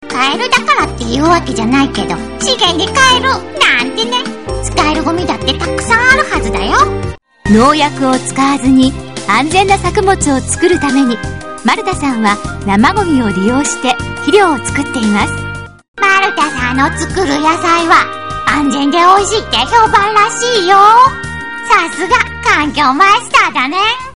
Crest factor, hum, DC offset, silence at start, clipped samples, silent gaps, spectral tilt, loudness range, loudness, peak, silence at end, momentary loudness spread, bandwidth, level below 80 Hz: 12 dB; none; 2%; 0 s; 0.5%; 15.88-15.94 s; -3.5 dB/octave; 3 LU; -11 LUFS; 0 dBFS; 0.05 s; 8 LU; 11 kHz; -30 dBFS